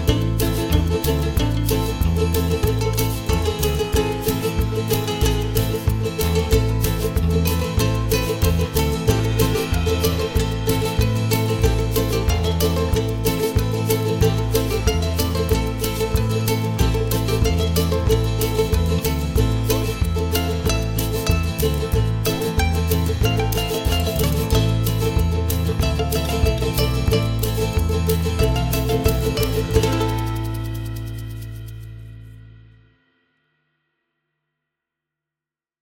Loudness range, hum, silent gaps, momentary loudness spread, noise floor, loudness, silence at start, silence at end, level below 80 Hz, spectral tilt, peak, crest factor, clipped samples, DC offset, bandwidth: 1 LU; none; none; 3 LU; -89 dBFS; -20 LUFS; 0 s; 3.25 s; -26 dBFS; -5.5 dB/octave; -2 dBFS; 16 dB; under 0.1%; under 0.1%; 17 kHz